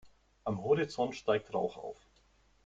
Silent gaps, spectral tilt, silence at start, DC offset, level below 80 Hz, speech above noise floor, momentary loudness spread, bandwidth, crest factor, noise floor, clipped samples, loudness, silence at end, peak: none; -6 dB/octave; 0.05 s; under 0.1%; -68 dBFS; 34 dB; 15 LU; 7.8 kHz; 20 dB; -68 dBFS; under 0.1%; -34 LUFS; 0.7 s; -16 dBFS